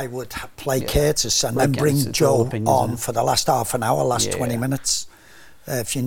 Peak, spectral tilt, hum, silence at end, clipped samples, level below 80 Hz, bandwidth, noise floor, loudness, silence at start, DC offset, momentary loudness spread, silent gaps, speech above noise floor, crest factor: -4 dBFS; -4 dB/octave; none; 0 s; under 0.1%; -40 dBFS; 17 kHz; -48 dBFS; -20 LUFS; 0 s; 0.5%; 10 LU; none; 27 dB; 18 dB